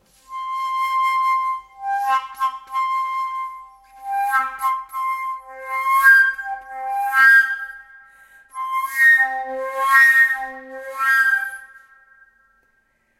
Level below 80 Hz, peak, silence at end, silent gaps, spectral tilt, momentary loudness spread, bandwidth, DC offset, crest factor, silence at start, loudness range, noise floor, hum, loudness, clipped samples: -64 dBFS; -2 dBFS; 1.4 s; none; 1 dB/octave; 19 LU; 16 kHz; under 0.1%; 18 dB; 0.3 s; 7 LU; -64 dBFS; none; -17 LUFS; under 0.1%